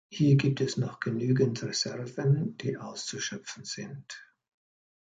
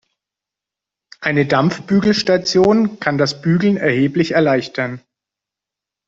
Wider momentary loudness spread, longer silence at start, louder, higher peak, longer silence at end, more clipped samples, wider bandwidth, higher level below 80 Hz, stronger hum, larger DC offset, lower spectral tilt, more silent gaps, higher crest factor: first, 15 LU vs 10 LU; second, 0.1 s vs 1.2 s; second, -30 LUFS vs -16 LUFS; second, -12 dBFS vs -2 dBFS; second, 0.8 s vs 1.1 s; neither; first, 9.2 kHz vs 7.8 kHz; second, -68 dBFS vs -54 dBFS; neither; neither; about the same, -5.5 dB/octave vs -6 dB/octave; neither; about the same, 18 dB vs 16 dB